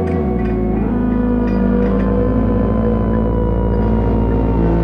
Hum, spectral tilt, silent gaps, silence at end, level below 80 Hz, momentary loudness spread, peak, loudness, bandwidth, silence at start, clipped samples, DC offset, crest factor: none; -11 dB/octave; none; 0 s; -20 dBFS; 2 LU; -4 dBFS; -16 LUFS; 5 kHz; 0 s; under 0.1%; under 0.1%; 10 dB